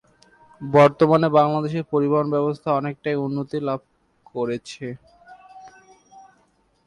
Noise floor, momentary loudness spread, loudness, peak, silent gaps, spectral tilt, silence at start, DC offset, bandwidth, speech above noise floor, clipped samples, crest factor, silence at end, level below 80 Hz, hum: -63 dBFS; 18 LU; -21 LUFS; -4 dBFS; none; -7.5 dB/octave; 0.6 s; under 0.1%; 11 kHz; 43 dB; under 0.1%; 18 dB; 0.65 s; -62 dBFS; none